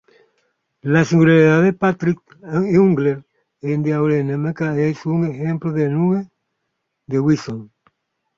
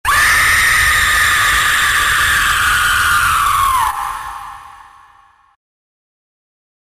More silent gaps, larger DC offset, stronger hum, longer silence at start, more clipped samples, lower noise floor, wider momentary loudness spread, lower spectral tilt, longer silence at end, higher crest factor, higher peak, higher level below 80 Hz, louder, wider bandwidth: neither; neither; neither; first, 0.85 s vs 0.05 s; neither; first, -75 dBFS vs -48 dBFS; about the same, 14 LU vs 13 LU; first, -8 dB/octave vs 0 dB/octave; second, 0.75 s vs 2.2 s; about the same, 16 dB vs 12 dB; about the same, -2 dBFS vs -4 dBFS; second, -56 dBFS vs -32 dBFS; second, -18 LUFS vs -11 LUFS; second, 7.4 kHz vs 16 kHz